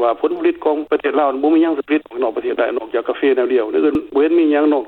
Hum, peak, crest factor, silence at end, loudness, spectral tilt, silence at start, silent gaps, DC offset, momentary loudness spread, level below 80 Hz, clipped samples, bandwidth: none; -4 dBFS; 12 dB; 0 s; -17 LUFS; -7.5 dB/octave; 0 s; none; under 0.1%; 6 LU; -54 dBFS; under 0.1%; 4.2 kHz